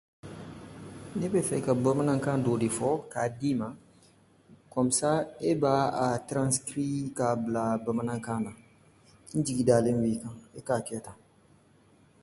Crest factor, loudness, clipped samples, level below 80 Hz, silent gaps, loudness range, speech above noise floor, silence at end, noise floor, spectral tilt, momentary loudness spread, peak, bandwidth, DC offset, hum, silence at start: 20 dB; -29 LUFS; under 0.1%; -62 dBFS; none; 2 LU; 33 dB; 1.1 s; -61 dBFS; -5.5 dB/octave; 17 LU; -8 dBFS; 12 kHz; under 0.1%; none; 0.25 s